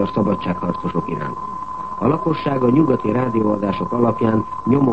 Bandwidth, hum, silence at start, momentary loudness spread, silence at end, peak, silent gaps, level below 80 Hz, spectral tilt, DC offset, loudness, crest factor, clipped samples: 8.2 kHz; none; 0 s; 10 LU; 0 s; -4 dBFS; none; -46 dBFS; -9.5 dB/octave; 1%; -19 LUFS; 16 dB; under 0.1%